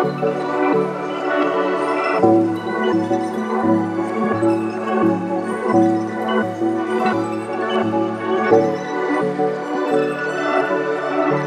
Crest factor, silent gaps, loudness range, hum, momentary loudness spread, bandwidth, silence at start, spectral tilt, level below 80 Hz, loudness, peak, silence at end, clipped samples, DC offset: 16 dB; none; 1 LU; none; 6 LU; 9.8 kHz; 0 s; -7 dB/octave; -62 dBFS; -19 LUFS; -2 dBFS; 0 s; under 0.1%; under 0.1%